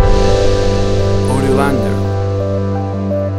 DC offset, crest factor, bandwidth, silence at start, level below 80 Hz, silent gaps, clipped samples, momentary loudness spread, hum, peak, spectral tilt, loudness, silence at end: under 0.1%; 12 dB; 12 kHz; 0 s; -20 dBFS; none; under 0.1%; 5 LU; none; 0 dBFS; -7 dB/octave; -15 LUFS; 0 s